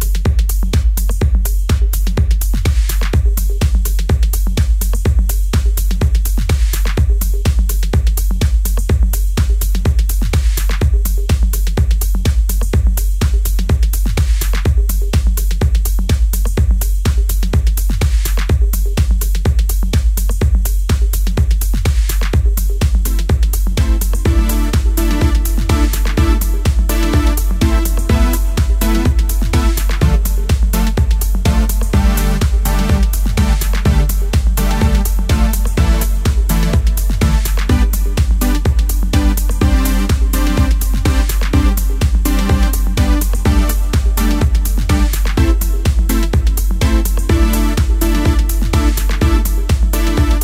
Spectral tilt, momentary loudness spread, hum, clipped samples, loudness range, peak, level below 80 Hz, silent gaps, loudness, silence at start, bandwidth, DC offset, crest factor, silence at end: -5.5 dB/octave; 2 LU; none; under 0.1%; 1 LU; 0 dBFS; -12 dBFS; none; -15 LUFS; 0 s; 16.5 kHz; under 0.1%; 12 dB; 0 s